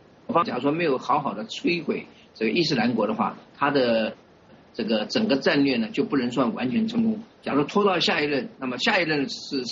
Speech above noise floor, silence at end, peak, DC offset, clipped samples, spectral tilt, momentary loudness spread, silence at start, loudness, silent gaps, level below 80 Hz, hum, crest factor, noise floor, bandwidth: 28 dB; 0 s; -8 dBFS; under 0.1%; under 0.1%; -3 dB/octave; 8 LU; 0.3 s; -24 LUFS; none; -64 dBFS; none; 16 dB; -52 dBFS; 7.6 kHz